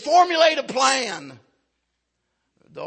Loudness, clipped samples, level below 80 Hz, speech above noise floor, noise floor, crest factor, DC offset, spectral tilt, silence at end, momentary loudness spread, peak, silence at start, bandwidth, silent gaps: -19 LUFS; under 0.1%; -76 dBFS; 57 dB; -76 dBFS; 20 dB; under 0.1%; -1.5 dB/octave; 0 s; 13 LU; -2 dBFS; 0 s; 8.8 kHz; none